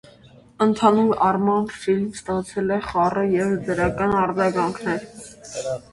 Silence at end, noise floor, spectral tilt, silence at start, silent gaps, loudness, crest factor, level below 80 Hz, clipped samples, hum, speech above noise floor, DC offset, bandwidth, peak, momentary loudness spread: 0.15 s; -49 dBFS; -6 dB/octave; 0.6 s; none; -21 LUFS; 18 dB; -48 dBFS; under 0.1%; none; 28 dB; under 0.1%; 11.5 kHz; -2 dBFS; 11 LU